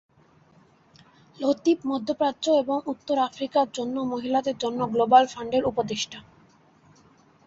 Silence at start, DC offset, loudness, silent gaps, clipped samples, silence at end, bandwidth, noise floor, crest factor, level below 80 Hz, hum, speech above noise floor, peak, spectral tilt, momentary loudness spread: 1.4 s; under 0.1%; -25 LUFS; none; under 0.1%; 1.25 s; 8 kHz; -58 dBFS; 22 dB; -64 dBFS; none; 34 dB; -4 dBFS; -4.5 dB/octave; 10 LU